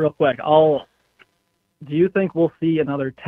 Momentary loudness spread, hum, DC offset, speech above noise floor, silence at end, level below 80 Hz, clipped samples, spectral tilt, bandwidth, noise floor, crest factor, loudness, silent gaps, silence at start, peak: 8 LU; none; under 0.1%; 51 dB; 0 s; -60 dBFS; under 0.1%; -9.5 dB/octave; 4 kHz; -69 dBFS; 18 dB; -19 LUFS; none; 0 s; -2 dBFS